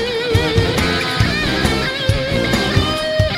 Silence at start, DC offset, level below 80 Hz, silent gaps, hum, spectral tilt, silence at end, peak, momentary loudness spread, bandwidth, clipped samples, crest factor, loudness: 0 s; under 0.1%; -28 dBFS; none; none; -5 dB/octave; 0 s; -2 dBFS; 2 LU; 16 kHz; under 0.1%; 14 dB; -16 LUFS